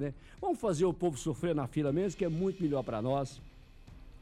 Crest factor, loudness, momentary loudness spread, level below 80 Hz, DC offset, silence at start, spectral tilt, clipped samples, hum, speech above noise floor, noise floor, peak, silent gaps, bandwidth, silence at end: 14 dB; -33 LUFS; 8 LU; -54 dBFS; under 0.1%; 0 s; -7 dB/octave; under 0.1%; none; 20 dB; -53 dBFS; -20 dBFS; none; 13.5 kHz; 0.05 s